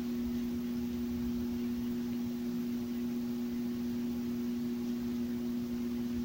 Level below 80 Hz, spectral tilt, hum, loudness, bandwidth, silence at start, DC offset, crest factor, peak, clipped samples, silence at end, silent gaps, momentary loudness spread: -54 dBFS; -6.5 dB/octave; none; -36 LUFS; 16 kHz; 0 s; under 0.1%; 8 dB; -26 dBFS; under 0.1%; 0 s; none; 1 LU